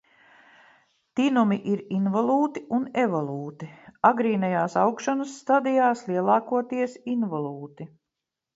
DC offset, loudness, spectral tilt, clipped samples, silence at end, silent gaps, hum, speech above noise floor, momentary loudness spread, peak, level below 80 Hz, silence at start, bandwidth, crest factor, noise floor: under 0.1%; -25 LUFS; -6.5 dB/octave; under 0.1%; 0.7 s; none; none; 61 dB; 13 LU; -4 dBFS; -74 dBFS; 1.15 s; 8 kHz; 20 dB; -86 dBFS